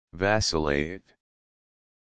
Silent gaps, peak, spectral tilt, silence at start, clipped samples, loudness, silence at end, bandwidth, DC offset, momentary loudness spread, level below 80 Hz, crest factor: none; -6 dBFS; -4 dB/octave; 0.05 s; under 0.1%; -26 LUFS; 0.95 s; 10 kHz; under 0.1%; 12 LU; -46 dBFS; 22 dB